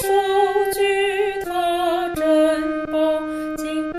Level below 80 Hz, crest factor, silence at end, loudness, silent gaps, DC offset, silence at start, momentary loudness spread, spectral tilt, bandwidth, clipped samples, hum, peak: -50 dBFS; 12 dB; 0 s; -20 LUFS; none; under 0.1%; 0 s; 7 LU; -3.5 dB/octave; 15.5 kHz; under 0.1%; none; -6 dBFS